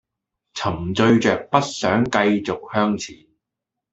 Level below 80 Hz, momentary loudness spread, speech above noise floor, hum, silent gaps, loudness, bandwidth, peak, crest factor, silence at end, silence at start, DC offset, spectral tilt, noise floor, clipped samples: -54 dBFS; 11 LU; 64 dB; none; none; -20 LUFS; 8 kHz; -2 dBFS; 20 dB; 0.8 s; 0.55 s; under 0.1%; -5.5 dB/octave; -84 dBFS; under 0.1%